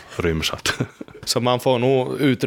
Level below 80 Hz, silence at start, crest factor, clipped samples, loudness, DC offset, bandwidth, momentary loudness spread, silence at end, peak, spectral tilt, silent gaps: -42 dBFS; 0 s; 16 dB; under 0.1%; -21 LUFS; under 0.1%; 18.5 kHz; 9 LU; 0 s; -4 dBFS; -4.5 dB/octave; none